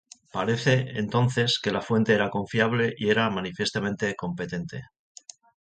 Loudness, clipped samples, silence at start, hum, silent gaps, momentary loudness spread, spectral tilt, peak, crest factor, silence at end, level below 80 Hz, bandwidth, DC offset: -25 LUFS; under 0.1%; 0.35 s; none; none; 13 LU; -5.5 dB/octave; -8 dBFS; 18 dB; 0.85 s; -58 dBFS; 9.2 kHz; under 0.1%